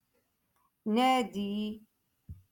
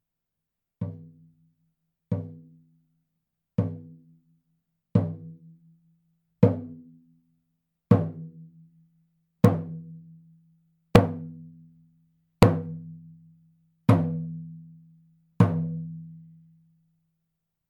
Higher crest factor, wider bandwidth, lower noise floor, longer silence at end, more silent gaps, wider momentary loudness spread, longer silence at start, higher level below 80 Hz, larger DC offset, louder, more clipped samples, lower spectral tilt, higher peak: second, 18 dB vs 30 dB; about the same, 17.5 kHz vs 18 kHz; second, -76 dBFS vs -85 dBFS; second, 0.2 s vs 1.5 s; neither; second, 15 LU vs 24 LU; about the same, 0.85 s vs 0.8 s; second, -64 dBFS vs -52 dBFS; neither; second, -31 LUFS vs -26 LUFS; neither; second, -5 dB/octave vs -8.5 dB/octave; second, -16 dBFS vs 0 dBFS